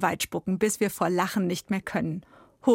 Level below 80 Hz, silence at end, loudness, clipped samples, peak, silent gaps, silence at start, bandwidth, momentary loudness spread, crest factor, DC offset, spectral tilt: -62 dBFS; 0 s; -27 LUFS; under 0.1%; -8 dBFS; none; 0 s; 16.5 kHz; 5 LU; 18 dB; under 0.1%; -5 dB/octave